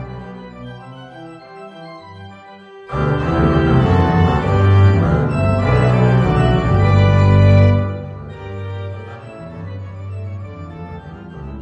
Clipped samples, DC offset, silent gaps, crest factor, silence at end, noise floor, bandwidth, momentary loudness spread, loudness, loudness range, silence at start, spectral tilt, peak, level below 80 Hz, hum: under 0.1%; under 0.1%; none; 14 dB; 0 s; -38 dBFS; 7.4 kHz; 23 LU; -14 LUFS; 16 LU; 0 s; -9 dB/octave; -2 dBFS; -30 dBFS; none